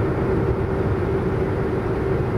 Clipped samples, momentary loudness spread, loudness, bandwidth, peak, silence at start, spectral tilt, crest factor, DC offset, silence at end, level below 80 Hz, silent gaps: under 0.1%; 2 LU; -22 LUFS; 11.5 kHz; -8 dBFS; 0 s; -9.5 dB/octave; 12 dB; under 0.1%; 0 s; -32 dBFS; none